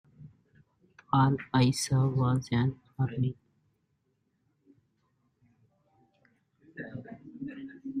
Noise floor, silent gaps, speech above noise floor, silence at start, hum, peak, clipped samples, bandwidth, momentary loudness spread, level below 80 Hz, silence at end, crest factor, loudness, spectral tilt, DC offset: -76 dBFS; none; 49 dB; 0.2 s; none; -12 dBFS; under 0.1%; 13 kHz; 19 LU; -62 dBFS; 0 s; 20 dB; -29 LUFS; -6 dB/octave; under 0.1%